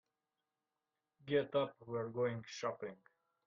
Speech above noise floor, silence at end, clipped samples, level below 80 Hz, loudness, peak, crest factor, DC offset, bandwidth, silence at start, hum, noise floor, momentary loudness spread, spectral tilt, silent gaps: over 51 dB; 0.5 s; under 0.1%; -82 dBFS; -40 LUFS; -22 dBFS; 20 dB; under 0.1%; 7 kHz; 1.25 s; none; under -90 dBFS; 13 LU; -4.5 dB/octave; none